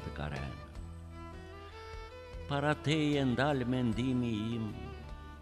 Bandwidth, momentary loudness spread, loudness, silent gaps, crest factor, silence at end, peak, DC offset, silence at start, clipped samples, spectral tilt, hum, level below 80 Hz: 12.5 kHz; 17 LU; -34 LUFS; none; 20 dB; 0 s; -16 dBFS; under 0.1%; 0 s; under 0.1%; -6.5 dB/octave; none; -50 dBFS